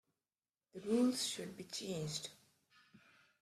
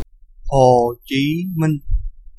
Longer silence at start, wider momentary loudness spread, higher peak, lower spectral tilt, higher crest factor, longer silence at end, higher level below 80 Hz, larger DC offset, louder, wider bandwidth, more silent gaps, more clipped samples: first, 0.75 s vs 0 s; first, 16 LU vs 12 LU; second, -24 dBFS vs 0 dBFS; second, -4 dB/octave vs -7 dB/octave; about the same, 18 dB vs 18 dB; first, 0.45 s vs 0.1 s; second, -80 dBFS vs -28 dBFS; neither; second, -39 LUFS vs -18 LUFS; first, 14.5 kHz vs 13 kHz; neither; neither